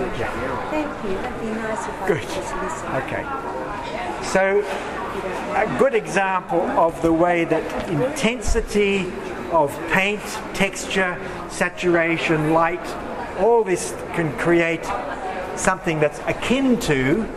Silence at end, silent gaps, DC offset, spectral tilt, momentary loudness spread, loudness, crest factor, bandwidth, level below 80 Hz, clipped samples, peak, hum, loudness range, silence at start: 0 s; none; under 0.1%; -5 dB/octave; 9 LU; -22 LUFS; 20 dB; 14.5 kHz; -38 dBFS; under 0.1%; -2 dBFS; none; 5 LU; 0 s